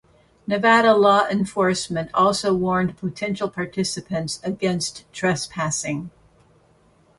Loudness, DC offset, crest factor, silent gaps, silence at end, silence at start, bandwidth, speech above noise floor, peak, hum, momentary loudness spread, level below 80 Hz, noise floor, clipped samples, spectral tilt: -21 LUFS; under 0.1%; 18 dB; none; 1.1 s; 0.5 s; 11.5 kHz; 36 dB; -4 dBFS; none; 12 LU; -56 dBFS; -57 dBFS; under 0.1%; -4.5 dB/octave